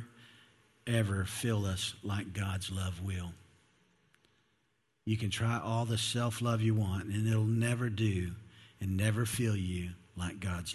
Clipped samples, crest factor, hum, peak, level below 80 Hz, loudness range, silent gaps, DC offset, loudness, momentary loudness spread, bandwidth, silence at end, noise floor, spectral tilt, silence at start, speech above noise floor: under 0.1%; 18 dB; none; -16 dBFS; -50 dBFS; 7 LU; none; under 0.1%; -34 LUFS; 10 LU; 13 kHz; 0 s; -77 dBFS; -5.5 dB/octave; 0 s; 45 dB